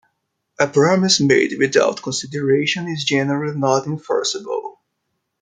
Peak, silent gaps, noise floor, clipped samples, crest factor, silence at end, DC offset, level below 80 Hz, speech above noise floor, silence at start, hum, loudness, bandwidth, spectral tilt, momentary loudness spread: -2 dBFS; none; -74 dBFS; under 0.1%; 18 dB; 0.7 s; under 0.1%; -62 dBFS; 56 dB; 0.6 s; none; -18 LUFS; 9.6 kHz; -4 dB/octave; 10 LU